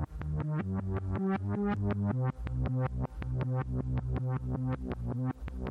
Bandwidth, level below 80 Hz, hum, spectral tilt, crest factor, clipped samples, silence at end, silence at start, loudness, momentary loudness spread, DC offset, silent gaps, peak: 4.4 kHz; -42 dBFS; none; -10 dB/octave; 12 dB; under 0.1%; 0 s; 0 s; -34 LUFS; 5 LU; under 0.1%; none; -20 dBFS